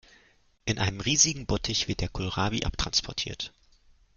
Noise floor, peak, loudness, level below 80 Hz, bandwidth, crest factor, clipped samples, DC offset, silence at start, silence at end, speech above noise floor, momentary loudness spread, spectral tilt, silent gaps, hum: -63 dBFS; -6 dBFS; -27 LUFS; -42 dBFS; 10.5 kHz; 24 dB; under 0.1%; under 0.1%; 0.65 s; 0.7 s; 34 dB; 12 LU; -2.5 dB/octave; none; none